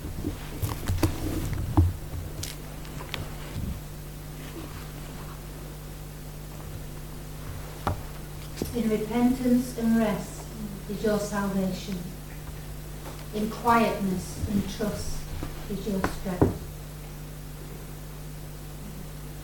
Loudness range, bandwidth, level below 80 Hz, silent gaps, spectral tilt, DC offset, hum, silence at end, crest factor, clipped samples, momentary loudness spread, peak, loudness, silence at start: 11 LU; 18 kHz; -40 dBFS; none; -6 dB/octave; under 0.1%; 50 Hz at -40 dBFS; 0 s; 22 dB; under 0.1%; 15 LU; -6 dBFS; -31 LUFS; 0 s